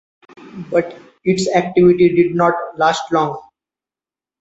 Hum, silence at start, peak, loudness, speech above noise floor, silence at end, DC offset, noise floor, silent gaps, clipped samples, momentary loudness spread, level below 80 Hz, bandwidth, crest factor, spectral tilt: none; 0.4 s; -2 dBFS; -16 LUFS; over 75 dB; 1 s; under 0.1%; under -90 dBFS; none; under 0.1%; 11 LU; -54 dBFS; 8 kHz; 16 dB; -6 dB/octave